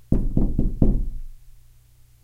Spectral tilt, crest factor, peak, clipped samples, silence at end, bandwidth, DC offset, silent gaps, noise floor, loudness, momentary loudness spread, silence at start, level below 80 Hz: -11 dB/octave; 20 dB; -2 dBFS; under 0.1%; 0.7 s; 1.3 kHz; under 0.1%; none; -52 dBFS; -25 LUFS; 13 LU; 0.1 s; -24 dBFS